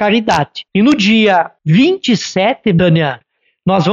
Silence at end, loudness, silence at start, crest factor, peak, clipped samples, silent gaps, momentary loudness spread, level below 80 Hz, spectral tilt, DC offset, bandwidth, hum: 0 s; -12 LUFS; 0 s; 12 dB; -2 dBFS; under 0.1%; none; 7 LU; -46 dBFS; -6 dB/octave; under 0.1%; 7.8 kHz; none